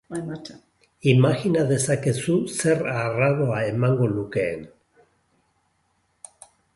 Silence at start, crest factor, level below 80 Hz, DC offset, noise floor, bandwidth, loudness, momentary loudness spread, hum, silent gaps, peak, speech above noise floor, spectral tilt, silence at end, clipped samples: 0.1 s; 20 dB; -58 dBFS; under 0.1%; -69 dBFS; 11.5 kHz; -22 LUFS; 16 LU; none; none; -4 dBFS; 47 dB; -6 dB/octave; 2.05 s; under 0.1%